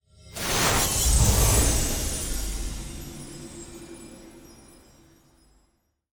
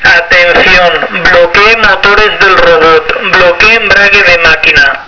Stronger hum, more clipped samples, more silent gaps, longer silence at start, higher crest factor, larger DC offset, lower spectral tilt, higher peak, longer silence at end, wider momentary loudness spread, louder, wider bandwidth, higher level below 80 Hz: neither; second, under 0.1% vs 10%; neither; first, 0.25 s vs 0 s; first, 20 dB vs 4 dB; neither; about the same, -3 dB/octave vs -3 dB/octave; second, -8 dBFS vs 0 dBFS; first, 1.6 s vs 0 s; first, 22 LU vs 3 LU; second, -23 LUFS vs -3 LUFS; first, over 20 kHz vs 5.4 kHz; about the same, -30 dBFS vs -26 dBFS